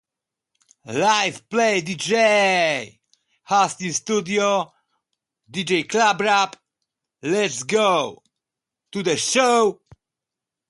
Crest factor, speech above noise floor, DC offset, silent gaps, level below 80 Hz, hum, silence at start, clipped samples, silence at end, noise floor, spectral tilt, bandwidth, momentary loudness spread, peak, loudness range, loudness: 18 dB; 66 dB; under 0.1%; none; -68 dBFS; none; 0.85 s; under 0.1%; 0.95 s; -86 dBFS; -3 dB/octave; 11.5 kHz; 12 LU; -4 dBFS; 3 LU; -20 LUFS